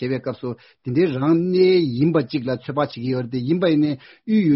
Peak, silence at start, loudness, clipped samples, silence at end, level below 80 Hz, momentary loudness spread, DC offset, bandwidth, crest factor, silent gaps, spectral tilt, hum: -4 dBFS; 0 s; -20 LUFS; under 0.1%; 0 s; -60 dBFS; 12 LU; under 0.1%; 5.8 kHz; 14 dB; none; -6.5 dB/octave; none